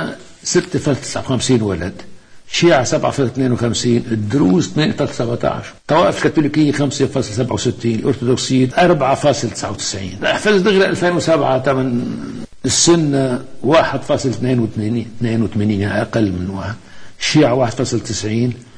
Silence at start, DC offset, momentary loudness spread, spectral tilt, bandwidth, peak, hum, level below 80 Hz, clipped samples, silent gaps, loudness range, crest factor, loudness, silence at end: 0 s; under 0.1%; 9 LU; -5 dB/octave; 10.5 kHz; -2 dBFS; none; -44 dBFS; under 0.1%; none; 3 LU; 14 dB; -16 LUFS; 0 s